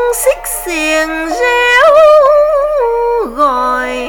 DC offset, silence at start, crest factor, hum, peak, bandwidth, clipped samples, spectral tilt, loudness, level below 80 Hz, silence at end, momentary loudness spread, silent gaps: under 0.1%; 0 s; 10 dB; none; 0 dBFS; 19.5 kHz; under 0.1%; -1.5 dB/octave; -10 LUFS; -36 dBFS; 0 s; 9 LU; none